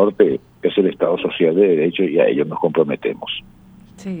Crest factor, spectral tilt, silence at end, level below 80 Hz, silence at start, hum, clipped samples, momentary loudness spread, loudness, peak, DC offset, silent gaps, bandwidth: 18 dB; -7.5 dB/octave; 0 s; -56 dBFS; 0 s; none; under 0.1%; 12 LU; -18 LUFS; 0 dBFS; under 0.1%; none; 7.8 kHz